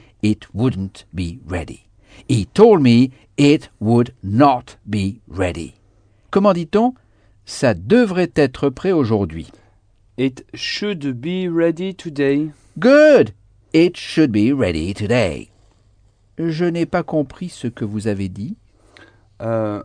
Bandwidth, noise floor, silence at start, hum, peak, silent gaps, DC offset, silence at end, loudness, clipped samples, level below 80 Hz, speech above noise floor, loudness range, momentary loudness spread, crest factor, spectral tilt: 10 kHz; -54 dBFS; 0.25 s; none; 0 dBFS; none; under 0.1%; 0 s; -18 LUFS; under 0.1%; -46 dBFS; 37 dB; 8 LU; 15 LU; 18 dB; -7 dB/octave